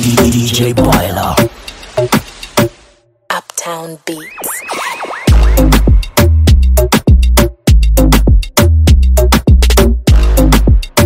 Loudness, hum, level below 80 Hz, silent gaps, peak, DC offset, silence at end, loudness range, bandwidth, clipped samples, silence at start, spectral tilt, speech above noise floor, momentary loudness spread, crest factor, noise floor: -11 LUFS; none; -12 dBFS; none; 0 dBFS; under 0.1%; 0 s; 8 LU; 16.5 kHz; 0.1%; 0 s; -5.5 dB/octave; 34 dB; 11 LU; 10 dB; -47 dBFS